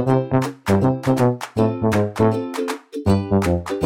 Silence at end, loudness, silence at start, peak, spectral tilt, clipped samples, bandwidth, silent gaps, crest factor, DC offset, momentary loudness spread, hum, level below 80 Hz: 0 s; -20 LUFS; 0 s; -4 dBFS; -7.5 dB/octave; under 0.1%; 16.5 kHz; none; 16 dB; 0.3%; 6 LU; none; -42 dBFS